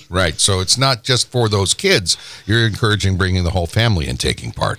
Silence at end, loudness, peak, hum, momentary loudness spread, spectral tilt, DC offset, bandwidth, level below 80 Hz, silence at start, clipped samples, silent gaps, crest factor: 0 s; -16 LUFS; -2 dBFS; none; 5 LU; -3.5 dB/octave; under 0.1%; 16 kHz; -30 dBFS; 0 s; under 0.1%; none; 14 dB